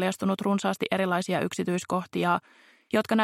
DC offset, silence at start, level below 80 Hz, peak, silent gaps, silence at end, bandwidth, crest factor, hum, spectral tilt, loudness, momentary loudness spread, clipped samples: under 0.1%; 0 s; -72 dBFS; -10 dBFS; none; 0 s; 15 kHz; 16 dB; none; -5.5 dB/octave; -28 LUFS; 3 LU; under 0.1%